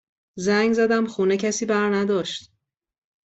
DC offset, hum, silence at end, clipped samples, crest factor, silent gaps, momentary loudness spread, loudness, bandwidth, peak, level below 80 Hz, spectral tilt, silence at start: under 0.1%; none; 0.85 s; under 0.1%; 14 dB; none; 8 LU; -22 LUFS; 8.2 kHz; -10 dBFS; -64 dBFS; -4.5 dB/octave; 0.35 s